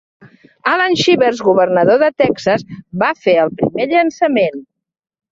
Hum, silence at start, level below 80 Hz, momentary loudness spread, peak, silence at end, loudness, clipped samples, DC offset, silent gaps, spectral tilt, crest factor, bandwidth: none; 0.65 s; -54 dBFS; 7 LU; -2 dBFS; 0.7 s; -14 LUFS; under 0.1%; under 0.1%; none; -5 dB/octave; 14 dB; 7.8 kHz